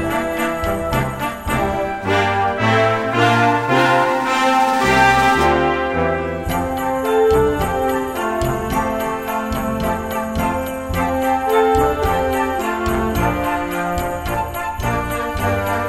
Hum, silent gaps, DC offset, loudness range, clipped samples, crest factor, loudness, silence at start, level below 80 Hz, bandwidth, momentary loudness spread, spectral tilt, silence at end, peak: none; none; 0.2%; 6 LU; under 0.1%; 16 dB; -18 LUFS; 0 s; -32 dBFS; 16 kHz; 8 LU; -5.5 dB/octave; 0 s; -2 dBFS